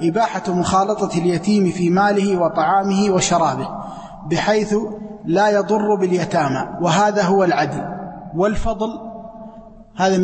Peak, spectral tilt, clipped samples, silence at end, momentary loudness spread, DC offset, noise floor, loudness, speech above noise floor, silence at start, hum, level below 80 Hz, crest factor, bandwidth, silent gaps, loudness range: -4 dBFS; -5.5 dB/octave; under 0.1%; 0 s; 15 LU; under 0.1%; -40 dBFS; -18 LUFS; 23 dB; 0 s; none; -40 dBFS; 14 dB; 8.8 kHz; none; 3 LU